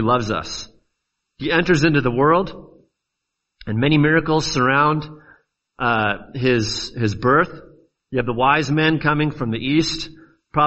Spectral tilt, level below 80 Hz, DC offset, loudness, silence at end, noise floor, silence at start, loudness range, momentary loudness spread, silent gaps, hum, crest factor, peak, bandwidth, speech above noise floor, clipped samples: -5.5 dB/octave; -44 dBFS; under 0.1%; -19 LUFS; 0 s; -79 dBFS; 0 s; 2 LU; 12 LU; none; none; 18 dB; -2 dBFS; 8.2 kHz; 61 dB; under 0.1%